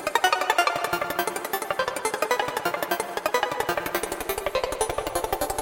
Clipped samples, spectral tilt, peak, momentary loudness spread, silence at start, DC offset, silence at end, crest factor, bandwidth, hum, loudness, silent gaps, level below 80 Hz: under 0.1%; -2 dB/octave; -6 dBFS; 6 LU; 0 s; under 0.1%; 0 s; 22 dB; 17 kHz; none; -26 LUFS; none; -48 dBFS